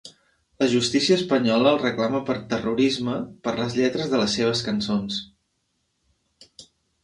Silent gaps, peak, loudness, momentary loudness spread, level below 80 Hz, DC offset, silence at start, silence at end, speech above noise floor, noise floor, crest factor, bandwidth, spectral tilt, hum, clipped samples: none; -6 dBFS; -23 LUFS; 8 LU; -58 dBFS; under 0.1%; 0.05 s; 0.4 s; 51 dB; -73 dBFS; 18 dB; 11.5 kHz; -4.5 dB/octave; none; under 0.1%